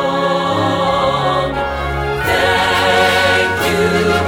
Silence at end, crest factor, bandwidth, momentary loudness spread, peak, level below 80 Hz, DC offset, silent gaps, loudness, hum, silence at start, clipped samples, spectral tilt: 0 s; 14 dB; 20 kHz; 7 LU; 0 dBFS; -32 dBFS; under 0.1%; none; -14 LUFS; none; 0 s; under 0.1%; -4.5 dB/octave